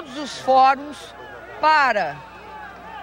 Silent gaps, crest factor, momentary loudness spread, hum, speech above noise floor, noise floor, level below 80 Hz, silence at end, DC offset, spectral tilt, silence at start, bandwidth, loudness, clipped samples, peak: none; 16 dB; 22 LU; none; 19 dB; -38 dBFS; -56 dBFS; 0 s; under 0.1%; -3 dB/octave; 0 s; 16 kHz; -19 LUFS; under 0.1%; -6 dBFS